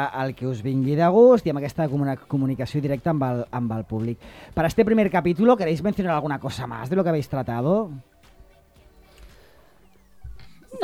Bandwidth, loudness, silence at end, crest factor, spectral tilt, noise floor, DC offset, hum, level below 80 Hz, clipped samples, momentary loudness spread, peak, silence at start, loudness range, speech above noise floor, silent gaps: 15 kHz; -22 LUFS; 0 s; 18 dB; -8 dB/octave; -56 dBFS; under 0.1%; none; -50 dBFS; under 0.1%; 10 LU; -4 dBFS; 0 s; 8 LU; 34 dB; none